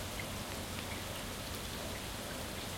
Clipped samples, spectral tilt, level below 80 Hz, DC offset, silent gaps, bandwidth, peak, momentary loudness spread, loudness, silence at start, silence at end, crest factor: under 0.1%; -3 dB/octave; -52 dBFS; under 0.1%; none; 16.5 kHz; -24 dBFS; 1 LU; -41 LUFS; 0 s; 0 s; 18 dB